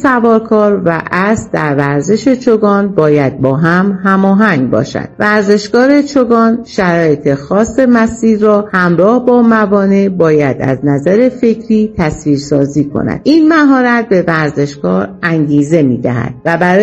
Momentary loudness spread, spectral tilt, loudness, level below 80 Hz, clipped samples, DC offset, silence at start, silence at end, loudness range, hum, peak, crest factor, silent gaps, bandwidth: 6 LU; -7 dB/octave; -10 LUFS; -42 dBFS; 0.7%; under 0.1%; 0 s; 0 s; 2 LU; none; 0 dBFS; 10 dB; none; 8.4 kHz